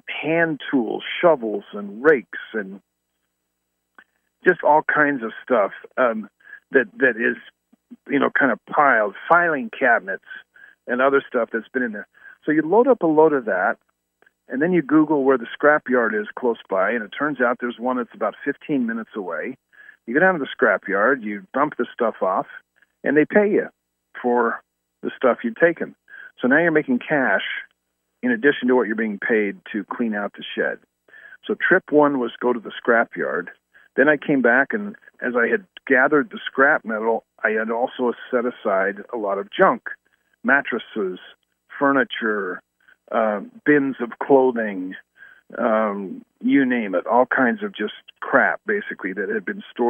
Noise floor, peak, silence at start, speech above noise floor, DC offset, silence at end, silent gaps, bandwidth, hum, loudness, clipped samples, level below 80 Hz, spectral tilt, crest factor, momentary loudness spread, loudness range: -76 dBFS; -2 dBFS; 0.05 s; 56 dB; under 0.1%; 0 s; none; 3.7 kHz; none; -20 LUFS; under 0.1%; -76 dBFS; -8.5 dB/octave; 20 dB; 13 LU; 3 LU